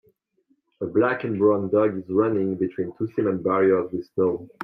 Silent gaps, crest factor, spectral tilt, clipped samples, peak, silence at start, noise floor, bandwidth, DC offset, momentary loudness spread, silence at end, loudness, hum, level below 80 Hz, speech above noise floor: none; 16 dB; -10.5 dB/octave; under 0.1%; -8 dBFS; 0.8 s; -68 dBFS; 5.2 kHz; under 0.1%; 7 LU; 0 s; -23 LUFS; none; -68 dBFS; 45 dB